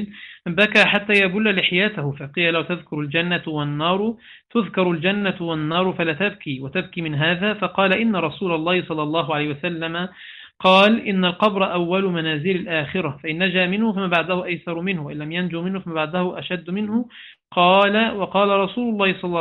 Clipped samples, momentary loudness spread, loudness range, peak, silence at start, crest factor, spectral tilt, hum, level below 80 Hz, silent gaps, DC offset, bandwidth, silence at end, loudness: under 0.1%; 11 LU; 4 LU; -2 dBFS; 0 s; 18 dB; -6.5 dB/octave; none; -60 dBFS; none; under 0.1%; 10.5 kHz; 0 s; -20 LUFS